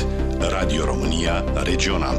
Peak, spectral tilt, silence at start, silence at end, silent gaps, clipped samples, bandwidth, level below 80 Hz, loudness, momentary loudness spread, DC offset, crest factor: -8 dBFS; -5 dB/octave; 0 s; 0 s; none; under 0.1%; 12 kHz; -24 dBFS; -22 LUFS; 2 LU; under 0.1%; 14 dB